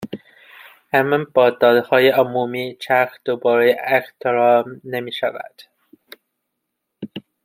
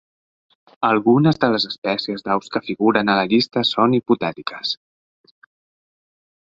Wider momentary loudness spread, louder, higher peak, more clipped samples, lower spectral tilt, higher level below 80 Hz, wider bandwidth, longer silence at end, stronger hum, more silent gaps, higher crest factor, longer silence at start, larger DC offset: first, 20 LU vs 10 LU; about the same, -18 LUFS vs -19 LUFS; about the same, -2 dBFS vs -2 dBFS; neither; about the same, -6 dB/octave vs -6.5 dB/octave; second, -68 dBFS vs -60 dBFS; first, 16.5 kHz vs 7.6 kHz; second, 0.25 s vs 1.75 s; neither; second, none vs 1.78-1.82 s; about the same, 18 dB vs 18 dB; second, 0 s vs 0.8 s; neither